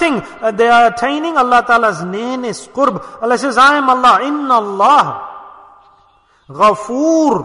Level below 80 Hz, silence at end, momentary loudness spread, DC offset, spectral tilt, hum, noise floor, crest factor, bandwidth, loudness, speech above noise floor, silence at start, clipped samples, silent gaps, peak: -52 dBFS; 0 s; 11 LU; under 0.1%; -4 dB/octave; none; -52 dBFS; 12 dB; 11 kHz; -12 LUFS; 39 dB; 0 s; under 0.1%; none; 0 dBFS